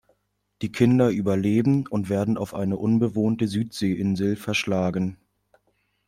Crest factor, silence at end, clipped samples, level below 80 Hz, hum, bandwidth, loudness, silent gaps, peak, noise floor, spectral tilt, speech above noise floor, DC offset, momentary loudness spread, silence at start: 18 dB; 0.95 s; under 0.1%; -58 dBFS; 50 Hz at -45 dBFS; 15.5 kHz; -24 LUFS; none; -6 dBFS; -70 dBFS; -7 dB/octave; 47 dB; under 0.1%; 6 LU; 0.6 s